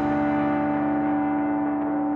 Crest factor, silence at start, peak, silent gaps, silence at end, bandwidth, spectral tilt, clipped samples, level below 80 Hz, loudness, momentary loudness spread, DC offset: 12 dB; 0 s; -12 dBFS; none; 0 s; 4.2 kHz; -9.5 dB/octave; under 0.1%; -52 dBFS; -24 LUFS; 2 LU; under 0.1%